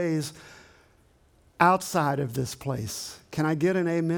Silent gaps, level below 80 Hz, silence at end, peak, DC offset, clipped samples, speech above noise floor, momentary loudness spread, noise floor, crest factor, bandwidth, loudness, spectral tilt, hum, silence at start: none; -60 dBFS; 0 s; -4 dBFS; under 0.1%; under 0.1%; 35 dB; 13 LU; -61 dBFS; 22 dB; 19.5 kHz; -27 LUFS; -5.5 dB/octave; none; 0 s